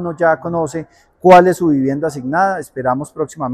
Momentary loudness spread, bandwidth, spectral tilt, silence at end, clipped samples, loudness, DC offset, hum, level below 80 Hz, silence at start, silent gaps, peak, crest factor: 14 LU; 14.5 kHz; -6.5 dB/octave; 0 s; 0.7%; -15 LUFS; under 0.1%; none; -52 dBFS; 0 s; none; 0 dBFS; 14 dB